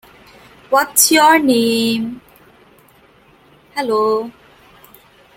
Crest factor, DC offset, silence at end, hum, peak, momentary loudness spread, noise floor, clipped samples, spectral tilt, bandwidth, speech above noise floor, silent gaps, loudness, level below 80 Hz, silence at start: 18 dB; under 0.1%; 1.05 s; none; 0 dBFS; 18 LU; -49 dBFS; under 0.1%; -2 dB/octave; 17 kHz; 35 dB; none; -14 LUFS; -58 dBFS; 0.7 s